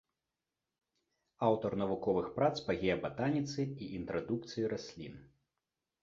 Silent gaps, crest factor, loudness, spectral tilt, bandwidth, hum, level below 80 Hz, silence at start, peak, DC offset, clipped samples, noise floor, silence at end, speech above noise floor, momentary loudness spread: none; 20 dB; -36 LUFS; -5.5 dB/octave; 7.6 kHz; none; -64 dBFS; 1.4 s; -16 dBFS; under 0.1%; under 0.1%; -90 dBFS; 0.75 s; 55 dB; 10 LU